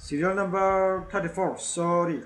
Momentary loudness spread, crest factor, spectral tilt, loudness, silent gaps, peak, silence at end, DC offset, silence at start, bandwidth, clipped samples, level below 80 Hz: 6 LU; 14 dB; -5 dB/octave; -26 LUFS; none; -12 dBFS; 0 s; under 0.1%; 0 s; 11.5 kHz; under 0.1%; -52 dBFS